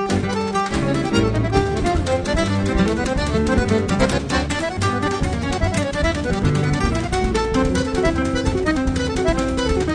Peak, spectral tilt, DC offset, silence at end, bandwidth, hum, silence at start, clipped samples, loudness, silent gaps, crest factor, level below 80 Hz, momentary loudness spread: -4 dBFS; -5.5 dB/octave; under 0.1%; 0 s; 10.5 kHz; none; 0 s; under 0.1%; -20 LUFS; none; 16 dB; -28 dBFS; 2 LU